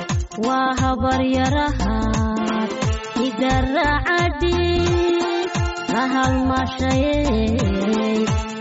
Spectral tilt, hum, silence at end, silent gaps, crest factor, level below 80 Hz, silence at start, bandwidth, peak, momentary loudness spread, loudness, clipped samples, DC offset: -5 dB/octave; none; 0 s; none; 12 dB; -28 dBFS; 0 s; 8 kHz; -8 dBFS; 4 LU; -20 LUFS; under 0.1%; under 0.1%